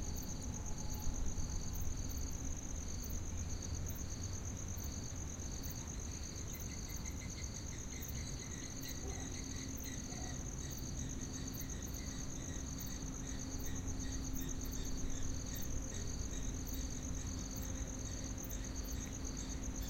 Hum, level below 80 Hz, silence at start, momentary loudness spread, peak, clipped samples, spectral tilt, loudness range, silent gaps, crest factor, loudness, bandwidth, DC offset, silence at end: none; -46 dBFS; 0 s; 2 LU; -24 dBFS; under 0.1%; -4 dB/octave; 1 LU; none; 16 dB; -44 LUFS; 16.5 kHz; under 0.1%; 0 s